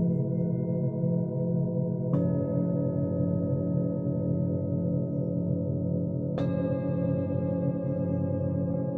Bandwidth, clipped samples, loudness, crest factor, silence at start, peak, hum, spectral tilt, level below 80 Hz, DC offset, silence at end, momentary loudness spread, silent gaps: 4 kHz; under 0.1%; -29 LUFS; 12 dB; 0 s; -16 dBFS; none; -13 dB/octave; -50 dBFS; under 0.1%; 0 s; 2 LU; none